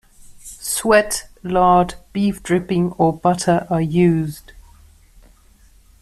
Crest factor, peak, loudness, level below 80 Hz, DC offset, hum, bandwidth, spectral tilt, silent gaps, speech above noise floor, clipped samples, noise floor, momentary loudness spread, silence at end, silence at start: 16 dB; -2 dBFS; -18 LUFS; -44 dBFS; under 0.1%; none; 14 kHz; -5.5 dB/octave; none; 33 dB; under 0.1%; -50 dBFS; 10 LU; 1.4 s; 0.25 s